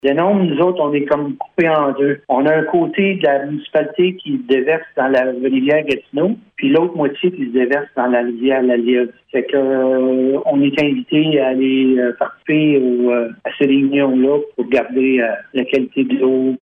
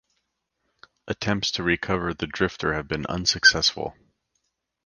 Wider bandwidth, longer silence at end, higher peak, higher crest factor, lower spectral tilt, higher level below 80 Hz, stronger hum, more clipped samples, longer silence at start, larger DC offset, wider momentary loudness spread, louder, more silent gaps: second, 5.4 kHz vs 10.5 kHz; second, 0.05 s vs 0.95 s; about the same, -2 dBFS vs -4 dBFS; second, 12 dB vs 22 dB; first, -8 dB/octave vs -3 dB/octave; second, -60 dBFS vs -48 dBFS; neither; neither; second, 0.05 s vs 1.05 s; neither; second, 5 LU vs 12 LU; first, -16 LUFS vs -23 LUFS; neither